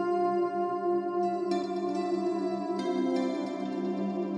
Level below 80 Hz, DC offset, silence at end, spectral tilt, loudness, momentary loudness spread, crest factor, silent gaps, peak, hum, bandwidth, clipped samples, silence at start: -84 dBFS; under 0.1%; 0 s; -7 dB/octave; -30 LUFS; 4 LU; 12 dB; none; -18 dBFS; none; 9.2 kHz; under 0.1%; 0 s